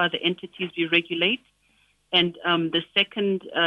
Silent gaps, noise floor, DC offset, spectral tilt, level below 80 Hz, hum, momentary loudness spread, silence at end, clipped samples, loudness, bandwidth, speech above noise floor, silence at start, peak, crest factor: none; -64 dBFS; under 0.1%; -6.5 dB/octave; -72 dBFS; none; 7 LU; 0 s; under 0.1%; -23 LUFS; 5.8 kHz; 40 dB; 0 s; -8 dBFS; 18 dB